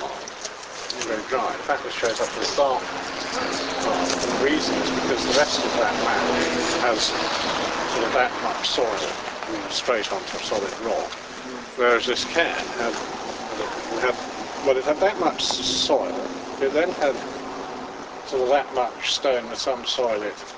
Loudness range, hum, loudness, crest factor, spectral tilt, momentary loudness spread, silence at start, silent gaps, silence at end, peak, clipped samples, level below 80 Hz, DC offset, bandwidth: 4 LU; none; -24 LUFS; 20 dB; -2 dB/octave; 11 LU; 0 s; none; 0 s; -4 dBFS; under 0.1%; -54 dBFS; under 0.1%; 8 kHz